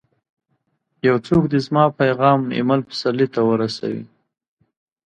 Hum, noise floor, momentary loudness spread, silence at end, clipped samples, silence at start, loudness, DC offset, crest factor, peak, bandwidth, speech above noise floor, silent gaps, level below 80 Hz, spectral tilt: none; -70 dBFS; 7 LU; 1 s; under 0.1%; 1.05 s; -19 LUFS; under 0.1%; 18 dB; -2 dBFS; 9.6 kHz; 52 dB; none; -54 dBFS; -7.5 dB/octave